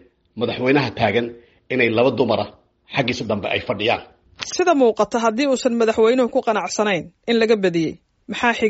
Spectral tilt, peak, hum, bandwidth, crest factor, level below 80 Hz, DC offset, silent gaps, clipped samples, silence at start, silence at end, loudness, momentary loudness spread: -3.5 dB/octave; -2 dBFS; none; 8 kHz; 18 dB; -56 dBFS; under 0.1%; none; under 0.1%; 0.35 s; 0 s; -19 LUFS; 10 LU